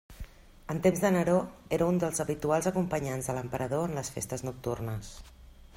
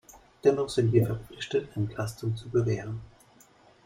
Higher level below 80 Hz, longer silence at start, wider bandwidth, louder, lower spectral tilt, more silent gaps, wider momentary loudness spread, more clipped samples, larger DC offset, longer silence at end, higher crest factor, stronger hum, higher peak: about the same, -52 dBFS vs -56 dBFS; about the same, 0.1 s vs 0.15 s; about the same, 16 kHz vs 15.5 kHz; about the same, -30 LUFS vs -28 LUFS; about the same, -6 dB/octave vs -7 dB/octave; neither; first, 20 LU vs 10 LU; neither; neither; second, 0.1 s vs 0.8 s; about the same, 20 dB vs 20 dB; neither; second, -12 dBFS vs -8 dBFS